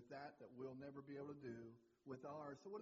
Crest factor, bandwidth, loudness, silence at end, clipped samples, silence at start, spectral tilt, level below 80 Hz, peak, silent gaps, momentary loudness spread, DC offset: 14 dB; 7.4 kHz; -56 LUFS; 0 s; under 0.1%; 0 s; -6.5 dB/octave; -88 dBFS; -42 dBFS; none; 5 LU; under 0.1%